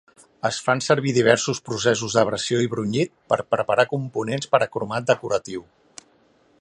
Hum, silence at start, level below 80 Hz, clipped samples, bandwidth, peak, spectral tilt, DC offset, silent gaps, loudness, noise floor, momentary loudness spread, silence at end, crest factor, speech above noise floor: none; 0.45 s; -60 dBFS; under 0.1%; 11.5 kHz; 0 dBFS; -4.5 dB/octave; under 0.1%; none; -22 LUFS; -59 dBFS; 8 LU; 1 s; 22 dB; 38 dB